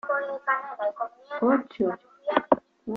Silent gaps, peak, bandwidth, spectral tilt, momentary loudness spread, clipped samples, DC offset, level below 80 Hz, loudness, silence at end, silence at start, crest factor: none; -4 dBFS; 5.8 kHz; -7.5 dB/octave; 9 LU; under 0.1%; under 0.1%; -68 dBFS; -27 LUFS; 0 s; 0.05 s; 24 dB